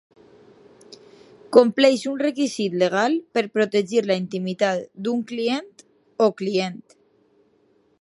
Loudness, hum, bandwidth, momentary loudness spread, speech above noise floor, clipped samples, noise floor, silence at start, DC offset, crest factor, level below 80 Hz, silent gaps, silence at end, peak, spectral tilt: -22 LUFS; none; 11.5 kHz; 10 LU; 41 dB; under 0.1%; -62 dBFS; 0.9 s; under 0.1%; 22 dB; -74 dBFS; none; 1.25 s; 0 dBFS; -5 dB/octave